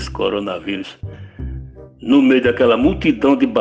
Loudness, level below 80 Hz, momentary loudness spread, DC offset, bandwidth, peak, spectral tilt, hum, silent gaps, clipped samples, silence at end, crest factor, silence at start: -16 LUFS; -36 dBFS; 19 LU; under 0.1%; 8 kHz; -2 dBFS; -7 dB/octave; none; none; under 0.1%; 0 s; 14 dB; 0 s